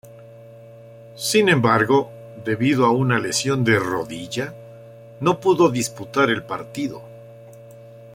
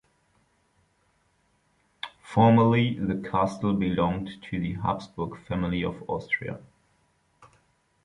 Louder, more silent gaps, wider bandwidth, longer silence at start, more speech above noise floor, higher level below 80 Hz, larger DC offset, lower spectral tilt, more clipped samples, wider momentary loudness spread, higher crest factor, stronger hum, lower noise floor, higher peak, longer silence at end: first, -20 LUFS vs -26 LUFS; neither; first, 16.5 kHz vs 10.5 kHz; second, 0.05 s vs 2.05 s; second, 23 dB vs 43 dB; second, -58 dBFS vs -52 dBFS; neither; second, -5 dB/octave vs -8 dB/octave; neither; second, 13 LU vs 16 LU; about the same, 20 dB vs 20 dB; neither; second, -43 dBFS vs -69 dBFS; first, -2 dBFS vs -6 dBFS; second, 0 s vs 0.6 s